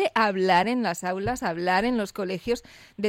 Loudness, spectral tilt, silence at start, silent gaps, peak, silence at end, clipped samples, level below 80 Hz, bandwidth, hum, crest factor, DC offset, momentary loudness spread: -25 LUFS; -5 dB/octave; 0 s; none; -8 dBFS; 0 s; under 0.1%; -52 dBFS; 16.5 kHz; none; 16 dB; under 0.1%; 9 LU